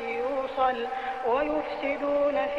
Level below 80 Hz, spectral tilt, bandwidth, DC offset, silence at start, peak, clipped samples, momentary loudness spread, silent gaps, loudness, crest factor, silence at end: -56 dBFS; -5.5 dB/octave; 7.4 kHz; 0.1%; 0 s; -14 dBFS; under 0.1%; 5 LU; none; -28 LUFS; 14 dB; 0 s